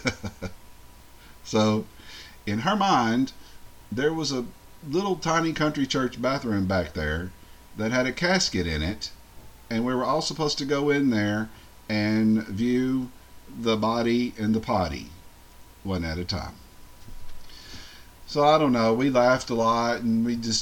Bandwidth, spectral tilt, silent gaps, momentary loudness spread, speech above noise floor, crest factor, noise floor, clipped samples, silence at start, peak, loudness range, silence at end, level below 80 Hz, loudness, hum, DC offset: 17 kHz; -5 dB/octave; none; 18 LU; 24 dB; 18 dB; -49 dBFS; under 0.1%; 0 s; -8 dBFS; 4 LU; 0 s; -46 dBFS; -25 LUFS; none; under 0.1%